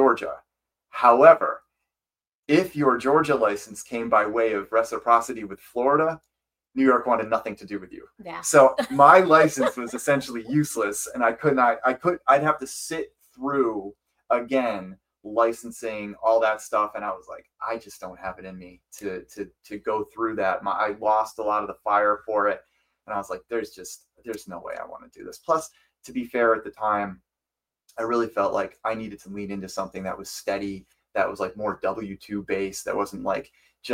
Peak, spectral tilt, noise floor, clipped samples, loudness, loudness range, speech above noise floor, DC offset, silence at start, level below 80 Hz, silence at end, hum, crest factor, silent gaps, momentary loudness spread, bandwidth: 0 dBFS; -5 dB/octave; under -90 dBFS; under 0.1%; -23 LUFS; 11 LU; over 66 dB; under 0.1%; 0 s; -62 dBFS; 0 s; none; 24 dB; 2.34-2.43 s; 17 LU; 16.5 kHz